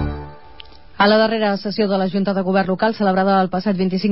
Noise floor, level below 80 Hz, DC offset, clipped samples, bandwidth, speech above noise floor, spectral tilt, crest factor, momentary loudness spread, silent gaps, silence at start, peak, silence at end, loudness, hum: -43 dBFS; -40 dBFS; 0.8%; under 0.1%; 5.8 kHz; 26 dB; -10.5 dB/octave; 14 dB; 5 LU; none; 0 s; -4 dBFS; 0 s; -18 LUFS; none